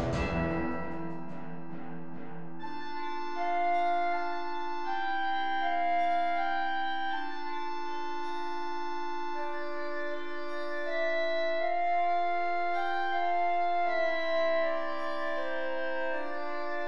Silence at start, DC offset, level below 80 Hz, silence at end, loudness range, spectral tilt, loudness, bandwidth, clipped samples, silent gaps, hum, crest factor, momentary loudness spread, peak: 0 s; 2%; -54 dBFS; 0 s; 7 LU; -6 dB/octave; -32 LUFS; 7.8 kHz; under 0.1%; none; none; 12 dB; 11 LU; -18 dBFS